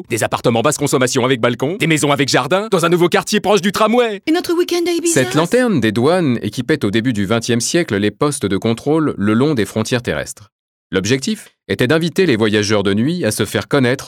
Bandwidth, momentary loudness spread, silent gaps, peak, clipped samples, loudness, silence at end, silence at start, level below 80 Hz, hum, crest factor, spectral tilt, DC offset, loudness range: 17.5 kHz; 5 LU; 10.52-10.90 s; 0 dBFS; under 0.1%; -15 LUFS; 0 s; 0 s; -52 dBFS; none; 14 dB; -4.5 dB/octave; under 0.1%; 3 LU